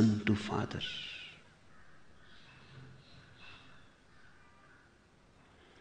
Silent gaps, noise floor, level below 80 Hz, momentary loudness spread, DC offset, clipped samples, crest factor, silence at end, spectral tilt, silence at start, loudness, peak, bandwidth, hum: none; -64 dBFS; -66 dBFS; 28 LU; under 0.1%; under 0.1%; 22 dB; 1.9 s; -6 dB/octave; 0 s; -36 LUFS; -16 dBFS; 9.4 kHz; none